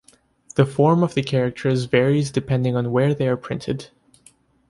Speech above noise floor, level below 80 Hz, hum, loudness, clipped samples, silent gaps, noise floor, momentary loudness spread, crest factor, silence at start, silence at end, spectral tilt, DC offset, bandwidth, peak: 36 dB; -54 dBFS; none; -21 LUFS; under 0.1%; none; -55 dBFS; 10 LU; 18 dB; 0.55 s; 0.85 s; -7 dB/octave; under 0.1%; 11.5 kHz; -4 dBFS